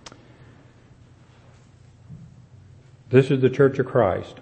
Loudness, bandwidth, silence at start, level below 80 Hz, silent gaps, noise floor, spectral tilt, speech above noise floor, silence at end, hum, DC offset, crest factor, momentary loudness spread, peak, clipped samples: -20 LUFS; 8.6 kHz; 2.1 s; -60 dBFS; none; -51 dBFS; -8 dB/octave; 32 dB; 0.1 s; none; under 0.1%; 22 dB; 3 LU; -2 dBFS; under 0.1%